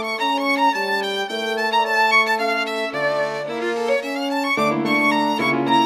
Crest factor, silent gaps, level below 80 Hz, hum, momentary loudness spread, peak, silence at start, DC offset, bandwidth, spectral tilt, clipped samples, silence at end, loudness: 14 dB; none; -66 dBFS; none; 7 LU; -6 dBFS; 0 s; under 0.1%; 16.5 kHz; -4 dB/octave; under 0.1%; 0 s; -19 LUFS